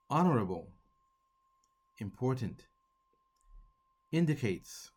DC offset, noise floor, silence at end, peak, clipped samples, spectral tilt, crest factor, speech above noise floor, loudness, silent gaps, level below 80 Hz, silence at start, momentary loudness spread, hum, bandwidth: under 0.1%; -76 dBFS; 0.1 s; -16 dBFS; under 0.1%; -7 dB/octave; 20 dB; 43 dB; -34 LUFS; none; -66 dBFS; 0.1 s; 16 LU; none; 17 kHz